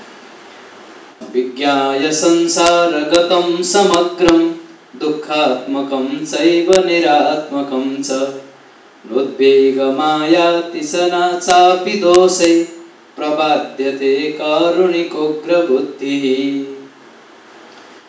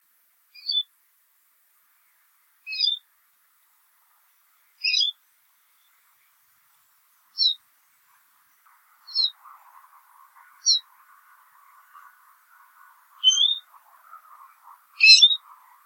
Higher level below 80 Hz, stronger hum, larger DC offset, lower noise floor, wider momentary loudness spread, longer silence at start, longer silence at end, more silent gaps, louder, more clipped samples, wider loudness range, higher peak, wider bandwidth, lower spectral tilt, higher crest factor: first, -52 dBFS vs under -90 dBFS; neither; neither; second, -43 dBFS vs -65 dBFS; second, 10 LU vs 21 LU; second, 0 s vs 0.65 s; first, 1.2 s vs 0.5 s; neither; first, -14 LUFS vs -19 LUFS; neither; second, 3 LU vs 10 LU; about the same, 0 dBFS vs 0 dBFS; second, 8 kHz vs 17 kHz; first, -3.5 dB/octave vs 10 dB/octave; second, 14 dB vs 26 dB